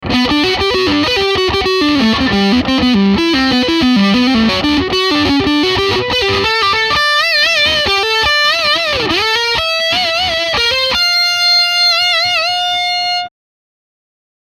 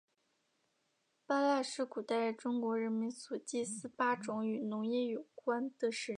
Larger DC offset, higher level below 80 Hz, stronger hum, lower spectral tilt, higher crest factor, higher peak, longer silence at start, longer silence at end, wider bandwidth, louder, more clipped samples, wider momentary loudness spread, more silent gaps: neither; first, -36 dBFS vs -90 dBFS; neither; about the same, -3.5 dB/octave vs -4 dB/octave; second, 12 dB vs 18 dB; first, 0 dBFS vs -20 dBFS; second, 0 s vs 1.3 s; first, 1.25 s vs 0.05 s; first, 15.5 kHz vs 11 kHz; first, -11 LUFS vs -37 LUFS; neither; second, 4 LU vs 7 LU; neither